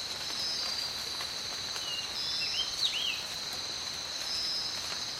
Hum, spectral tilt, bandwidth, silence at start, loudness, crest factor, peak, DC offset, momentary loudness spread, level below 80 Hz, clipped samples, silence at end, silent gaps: none; 0 dB/octave; 16 kHz; 0 s; -32 LUFS; 18 dB; -18 dBFS; under 0.1%; 5 LU; -62 dBFS; under 0.1%; 0 s; none